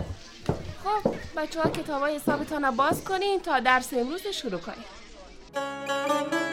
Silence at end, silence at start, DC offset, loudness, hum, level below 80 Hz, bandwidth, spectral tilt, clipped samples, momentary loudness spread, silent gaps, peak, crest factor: 0 s; 0 s; under 0.1%; -28 LUFS; none; -50 dBFS; 17 kHz; -4.5 dB/octave; under 0.1%; 14 LU; none; -8 dBFS; 20 dB